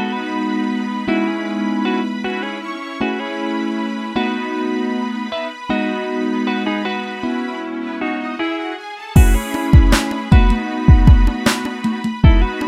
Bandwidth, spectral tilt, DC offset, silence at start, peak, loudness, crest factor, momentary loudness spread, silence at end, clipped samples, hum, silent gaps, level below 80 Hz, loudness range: 15 kHz; -6.5 dB/octave; under 0.1%; 0 s; 0 dBFS; -18 LUFS; 16 dB; 10 LU; 0 s; under 0.1%; none; none; -20 dBFS; 7 LU